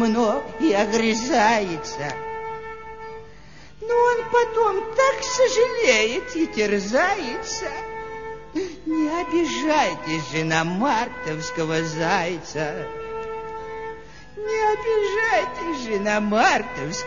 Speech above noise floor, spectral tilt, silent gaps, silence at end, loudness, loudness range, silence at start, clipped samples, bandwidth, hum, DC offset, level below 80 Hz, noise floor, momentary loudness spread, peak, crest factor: 24 dB; -4 dB/octave; none; 0 s; -22 LUFS; 5 LU; 0 s; under 0.1%; 7.4 kHz; none; 0.6%; -50 dBFS; -46 dBFS; 14 LU; -4 dBFS; 20 dB